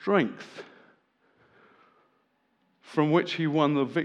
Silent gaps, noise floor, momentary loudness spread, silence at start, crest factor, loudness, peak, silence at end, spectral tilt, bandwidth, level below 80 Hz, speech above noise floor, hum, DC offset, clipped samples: none; -71 dBFS; 19 LU; 0 s; 20 dB; -26 LUFS; -8 dBFS; 0 s; -7 dB/octave; 9.2 kHz; -88 dBFS; 46 dB; none; under 0.1%; under 0.1%